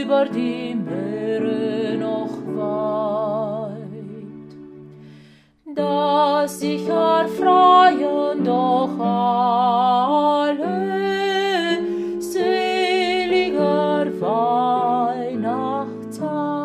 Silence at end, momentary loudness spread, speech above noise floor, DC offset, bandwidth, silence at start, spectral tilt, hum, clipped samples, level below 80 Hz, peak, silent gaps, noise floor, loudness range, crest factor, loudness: 0 s; 9 LU; 31 dB; under 0.1%; 14.5 kHz; 0 s; -5.5 dB/octave; none; under 0.1%; -62 dBFS; -2 dBFS; none; -49 dBFS; 9 LU; 18 dB; -20 LUFS